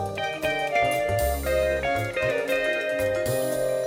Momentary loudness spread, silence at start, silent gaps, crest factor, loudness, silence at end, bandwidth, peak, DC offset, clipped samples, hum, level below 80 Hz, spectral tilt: 3 LU; 0 s; none; 14 dB; -25 LUFS; 0 s; 17 kHz; -12 dBFS; under 0.1%; under 0.1%; none; -40 dBFS; -4.5 dB/octave